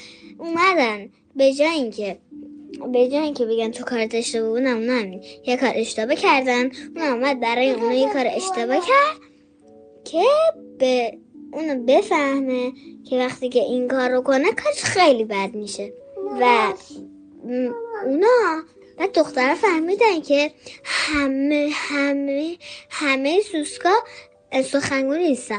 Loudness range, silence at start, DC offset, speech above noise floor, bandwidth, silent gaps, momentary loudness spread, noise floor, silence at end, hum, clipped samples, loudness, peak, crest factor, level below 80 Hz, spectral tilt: 2 LU; 0 s; under 0.1%; 31 dB; 10 kHz; none; 14 LU; -51 dBFS; 0 s; none; under 0.1%; -20 LUFS; -4 dBFS; 16 dB; -60 dBFS; -3.5 dB/octave